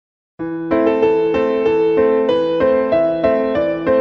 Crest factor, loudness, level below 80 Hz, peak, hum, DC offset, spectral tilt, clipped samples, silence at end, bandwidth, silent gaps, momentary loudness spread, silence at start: 12 dB; -16 LUFS; -46 dBFS; -2 dBFS; none; under 0.1%; -7.5 dB/octave; under 0.1%; 0 s; 6 kHz; none; 4 LU; 0.4 s